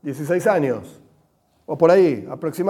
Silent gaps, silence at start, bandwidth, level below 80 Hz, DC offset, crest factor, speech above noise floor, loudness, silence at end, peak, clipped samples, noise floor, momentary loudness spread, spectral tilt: none; 0.05 s; 15 kHz; -66 dBFS; under 0.1%; 18 dB; 43 dB; -19 LUFS; 0 s; -2 dBFS; under 0.1%; -62 dBFS; 14 LU; -7 dB/octave